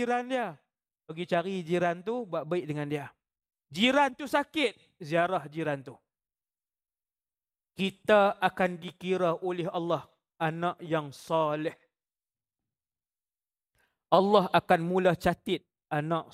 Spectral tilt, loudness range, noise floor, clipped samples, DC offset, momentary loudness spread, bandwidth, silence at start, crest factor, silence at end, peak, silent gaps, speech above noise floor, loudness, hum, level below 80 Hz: -6 dB/octave; 6 LU; under -90 dBFS; under 0.1%; under 0.1%; 11 LU; 15.5 kHz; 0 s; 24 dB; 0.1 s; -8 dBFS; none; over 61 dB; -29 LUFS; none; -66 dBFS